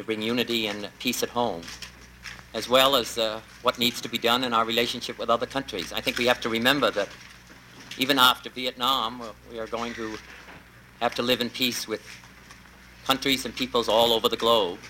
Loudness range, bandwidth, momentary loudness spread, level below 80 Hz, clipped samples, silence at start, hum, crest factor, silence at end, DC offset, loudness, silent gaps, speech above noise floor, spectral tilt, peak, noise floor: 5 LU; 17 kHz; 18 LU; -56 dBFS; under 0.1%; 0 s; 60 Hz at -60 dBFS; 24 dB; 0 s; under 0.1%; -25 LUFS; none; 24 dB; -3 dB/octave; -2 dBFS; -49 dBFS